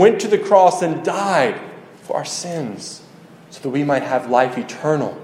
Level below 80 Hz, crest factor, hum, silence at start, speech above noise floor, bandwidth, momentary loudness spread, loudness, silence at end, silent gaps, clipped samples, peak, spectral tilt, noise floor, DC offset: -68 dBFS; 18 dB; none; 0 s; 25 dB; 15 kHz; 18 LU; -18 LUFS; 0 s; none; under 0.1%; 0 dBFS; -5 dB/octave; -43 dBFS; under 0.1%